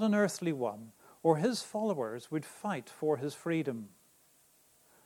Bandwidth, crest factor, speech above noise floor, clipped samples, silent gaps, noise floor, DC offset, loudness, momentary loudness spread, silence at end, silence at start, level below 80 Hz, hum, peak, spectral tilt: 18 kHz; 22 dB; 33 dB; under 0.1%; none; -66 dBFS; under 0.1%; -34 LUFS; 11 LU; 1.2 s; 0 s; -82 dBFS; none; -12 dBFS; -5.5 dB/octave